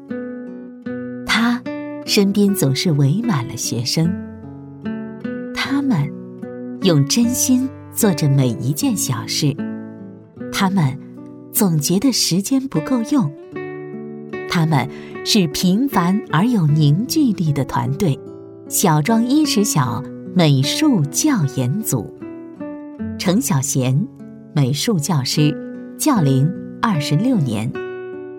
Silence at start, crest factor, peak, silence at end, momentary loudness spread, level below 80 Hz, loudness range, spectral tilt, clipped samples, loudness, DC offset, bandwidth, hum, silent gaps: 0 s; 16 dB; -2 dBFS; 0 s; 16 LU; -54 dBFS; 4 LU; -5 dB/octave; under 0.1%; -18 LUFS; under 0.1%; 18 kHz; none; none